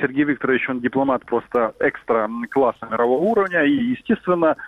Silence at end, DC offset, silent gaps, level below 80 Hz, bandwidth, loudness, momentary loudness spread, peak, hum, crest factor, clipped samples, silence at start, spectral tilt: 0 s; under 0.1%; none; -58 dBFS; 5.4 kHz; -20 LUFS; 4 LU; -4 dBFS; none; 16 dB; under 0.1%; 0 s; -8 dB/octave